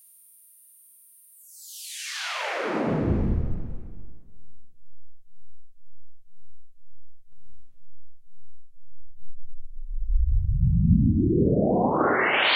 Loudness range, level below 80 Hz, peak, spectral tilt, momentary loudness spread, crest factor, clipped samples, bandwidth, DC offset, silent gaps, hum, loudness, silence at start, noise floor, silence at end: 14 LU; -32 dBFS; -8 dBFS; -6 dB/octave; 20 LU; 18 dB; under 0.1%; 16.5 kHz; under 0.1%; none; none; -24 LUFS; 1.5 s; -54 dBFS; 0 s